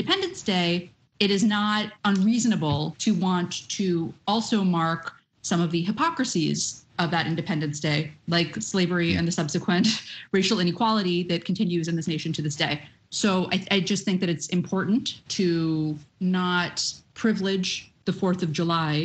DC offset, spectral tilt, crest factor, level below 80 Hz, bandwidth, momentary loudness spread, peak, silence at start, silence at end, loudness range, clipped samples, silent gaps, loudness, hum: under 0.1%; -4.5 dB/octave; 18 dB; -60 dBFS; 8.8 kHz; 6 LU; -6 dBFS; 0 s; 0 s; 2 LU; under 0.1%; none; -25 LUFS; none